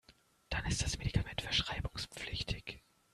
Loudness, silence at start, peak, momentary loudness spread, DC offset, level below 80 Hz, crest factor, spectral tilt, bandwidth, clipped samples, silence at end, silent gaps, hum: -37 LUFS; 0.1 s; -18 dBFS; 9 LU; under 0.1%; -46 dBFS; 22 dB; -3.5 dB/octave; 13.5 kHz; under 0.1%; 0.35 s; none; none